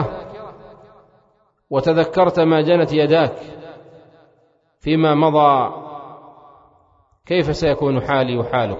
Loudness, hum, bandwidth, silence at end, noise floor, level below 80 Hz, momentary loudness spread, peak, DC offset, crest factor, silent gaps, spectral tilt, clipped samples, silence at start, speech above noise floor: -17 LUFS; none; 7.6 kHz; 0 s; -60 dBFS; -48 dBFS; 21 LU; -2 dBFS; under 0.1%; 18 dB; none; -7.5 dB/octave; under 0.1%; 0 s; 44 dB